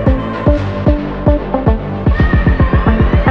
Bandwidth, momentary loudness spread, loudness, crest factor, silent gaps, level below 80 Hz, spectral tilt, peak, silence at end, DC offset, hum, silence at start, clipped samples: 5.6 kHz; 3 LU; -14 LUFS; 12 dB; none; -16 dBFS; -9.5 dB/octave; 0 dBFS; 0 s; 0.8%; none; 0 s; under 0.1%